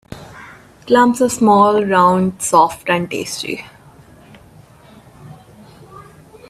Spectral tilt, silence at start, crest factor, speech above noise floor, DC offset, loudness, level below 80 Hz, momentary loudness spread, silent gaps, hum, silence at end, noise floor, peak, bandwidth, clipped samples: -4.5 dB/octave; 0.1 s; 18 dB; 30 dB; under 0.1%; -14 LUFS; -52 dBFS; 16 LU; none; none; 0.5 s; -44 dBFS; 0 dBFS; 15 kHz; under 0.1%